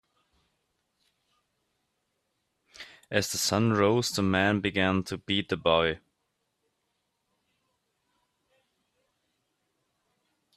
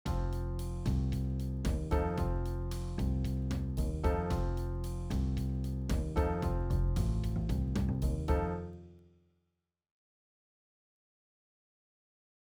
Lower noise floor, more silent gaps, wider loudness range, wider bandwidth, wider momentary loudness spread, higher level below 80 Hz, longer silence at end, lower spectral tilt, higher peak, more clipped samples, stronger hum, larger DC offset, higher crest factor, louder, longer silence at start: second, -79 dBFS vs -84 dBFS; neither; first, 8 LU vs 5 LU; second, 14 kHz vs 17 kHz; about the same, 7 LU vs 5 LU; second, -64 dBFS vs -38 dBFS; first, 4.6 s vs 3.5 s; second, -4.5 dB/octave vs -7.5 dB/octave; first, -8 dBFS vs -18 dBFS; neither; neither; neither; first, 24 dB vs 16 dB; first, -26 LUFS vs -35 LUFS; first, 2.8 s vs 0.05 s